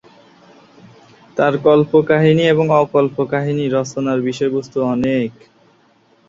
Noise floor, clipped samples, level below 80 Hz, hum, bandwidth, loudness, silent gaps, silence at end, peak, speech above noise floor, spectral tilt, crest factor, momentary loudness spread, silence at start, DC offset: -54 dBFS; under 0.1%; -56 dBFS; none; 7.8 kHz; -16 LUFS; none; 0.95 s; -2 dBFS; 39 dB; -7 dB/octave; 16 dB; 7 LU; 1.35 s; under 0.1%